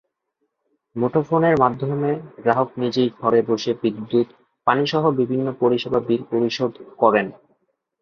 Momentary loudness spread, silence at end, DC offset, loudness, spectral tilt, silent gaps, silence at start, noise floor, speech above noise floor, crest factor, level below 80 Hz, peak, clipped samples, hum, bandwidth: 7 LU; 0.7 s; under 0.1%; -21 LUFS; -7 dB/octave; none; 0.95 s; -75 dBFS; 55 dB; 20 dB; -60 dBFS; -2 dBFS; under 0.1%; none; 7 kHz